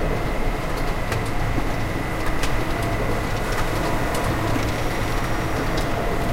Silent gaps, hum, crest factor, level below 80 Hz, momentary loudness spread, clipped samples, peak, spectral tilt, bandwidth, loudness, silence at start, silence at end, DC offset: none; none; 14 dB; -26 dBFS; 3 LU; under 0.1%; -8 dBFS; -5.5 dB/octave; 16.5 kHz; -24 LUFS; 0 s; 0 s; under 0.1%